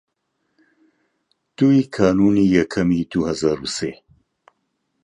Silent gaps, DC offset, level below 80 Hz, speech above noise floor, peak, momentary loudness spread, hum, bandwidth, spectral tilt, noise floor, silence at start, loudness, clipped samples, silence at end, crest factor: none; under 0.1%; -48 dBFS; 55 dB; -2 dBFS; 9 LU; none; 10.5 kHz; -6.5 dB/octave; -72 dBFS; 1.6 s; -18 LUFS; under 0.1%; 1.1 s; 18 dB